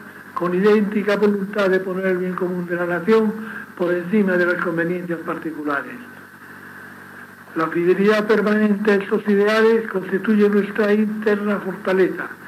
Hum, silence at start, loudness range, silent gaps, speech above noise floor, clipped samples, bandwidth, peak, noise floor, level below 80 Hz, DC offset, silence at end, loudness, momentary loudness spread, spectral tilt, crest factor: none; 0 s; 6 LU; none; 21 dB; under 0.1%; 14.5 kHz; -4 dBFS; -40 dBFS; -84 dBFS; under 0.1%; 0 s; -19 LUFS; 18 LU; -7.5 dB/octave; 16 dB